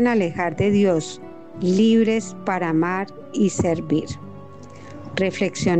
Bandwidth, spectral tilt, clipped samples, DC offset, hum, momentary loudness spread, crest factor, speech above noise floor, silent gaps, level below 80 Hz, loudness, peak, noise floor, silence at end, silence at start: 9 kHz; -6 dB/octave; under 0.1%; 0.6%; none; 21 LU; 14 dB; 20 dB; none; -52 dBFS; -21 LUFS; -8 dBFS; -40 dBFS; 0 s; 0 s